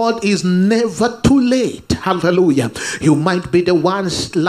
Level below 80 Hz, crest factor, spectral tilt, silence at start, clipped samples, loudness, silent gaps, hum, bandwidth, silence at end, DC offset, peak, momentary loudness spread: -40 dBFS; 14 dB; -5.5 dB/octave; 0 s; under 0.1%; -15 LUFS; none; none; 14.5 kHz; 0 s; under 0.1%; 0 dBFS; 5 LU